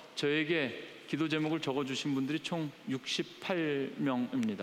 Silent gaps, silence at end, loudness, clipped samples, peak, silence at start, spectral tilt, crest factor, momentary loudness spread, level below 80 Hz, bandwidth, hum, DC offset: none; 0 s; -34 LUFS; under 0.1%; -20 dBFS; 0 s; -5 dB/octave; 14 dB; 6 LU; -80 dBFS; 15 kHz; none; under 0.1%